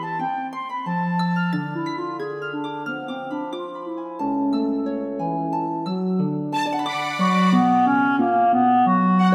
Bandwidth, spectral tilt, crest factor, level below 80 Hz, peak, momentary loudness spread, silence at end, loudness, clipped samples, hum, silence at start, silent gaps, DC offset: 10.5 kHz; -7 dB/octave; 14 dB; -66 dBFS; -6 dBFS; 12 LU; 0 s; -22 LUFS; under 0.1%; none; 0 s; none; under 0.1%